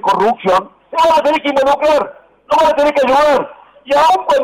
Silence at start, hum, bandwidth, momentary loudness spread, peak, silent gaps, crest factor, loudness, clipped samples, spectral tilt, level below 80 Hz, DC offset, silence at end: 0.05 s; none; 16 kHz; 6 LU; -6 dBFS; none; 6 dB; -13 LUFS; under 0.1%; -4 dB/octave; -48 dBFS; under 0.1%; 0 s